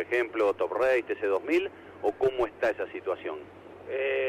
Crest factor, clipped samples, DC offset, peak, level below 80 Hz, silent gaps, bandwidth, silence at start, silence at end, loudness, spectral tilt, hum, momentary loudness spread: 12 dB; under 0.1%; under 0.1%; -18 dBFS; -62 dBFS; none; 13 kHz; 0 s; 0 s; -29 LUFS; -5.5 dB/octave; none; 12 LU